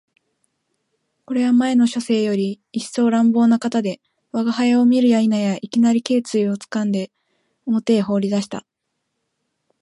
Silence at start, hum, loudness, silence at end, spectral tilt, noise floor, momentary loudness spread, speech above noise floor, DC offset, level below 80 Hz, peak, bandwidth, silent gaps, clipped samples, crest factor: 1.3 s; none; -19 LUFS; 1.2 s; -6 dB/octave; -75 dBFS; 12 LU; 58 dB; under 0.1%; -68 dBFS; -4 dBFS; 11.5 kHz; none; under 0.1%; 16 dB